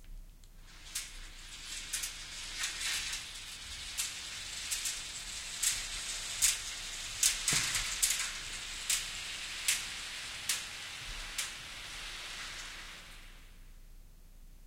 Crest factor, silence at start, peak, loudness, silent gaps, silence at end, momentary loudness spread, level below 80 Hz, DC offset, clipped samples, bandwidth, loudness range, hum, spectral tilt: 28 dB; 0 s; -10 dBFS; -35 LUFS; none; 0 s; 14 LU; -54 dBFS; under 0.1%; under 0.1%; 16.5 kHz; 9 LU; none; 1 dB/octave